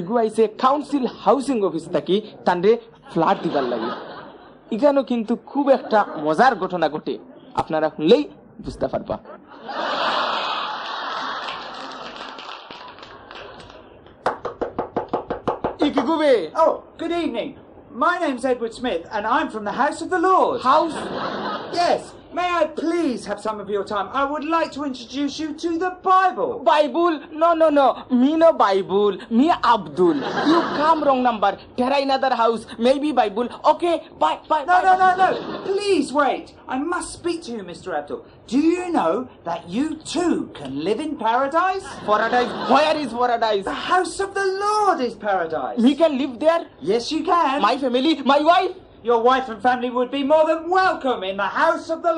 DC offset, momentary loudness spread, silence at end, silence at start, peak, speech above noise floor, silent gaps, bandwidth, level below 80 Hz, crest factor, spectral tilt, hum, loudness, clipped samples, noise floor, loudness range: under 0.1%; 12 LU; 0 s; 0 s; -2 dBFS; 25 dB; none; 11 kHz; -56 dBFS; 18 dB; -5 dB/octave; none; -20 LUFS; under 0.1%; -45 dBFS; 7 LU